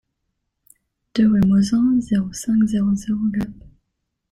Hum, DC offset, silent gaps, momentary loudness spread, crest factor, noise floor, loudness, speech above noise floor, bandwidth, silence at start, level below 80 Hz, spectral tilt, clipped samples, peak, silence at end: none; under 0.1%; none; 9 LU; 14 dB; -76 dBFS; -19 LUFS; 58 dB; 12.5 kHz; 1.15 s; -46 dBFS; -6.5 dB/octave; under 0.1%; -6 dBFS; 0.8 s